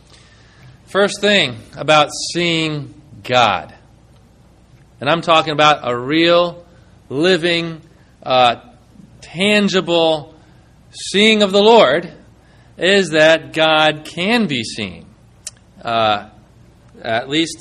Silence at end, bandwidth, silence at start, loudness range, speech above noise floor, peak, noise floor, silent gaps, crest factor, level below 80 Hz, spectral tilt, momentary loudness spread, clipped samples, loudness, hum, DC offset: 0.05 s; 12.5 kHz; 0.9 s; 5 LU; 33 dB; 0 dBFS; -48 dBFS; none; 16 dB; -52 dBFS; -4 dB/octave; 17 LU; under 0.1%; -15 LUFS; none; under 0.1%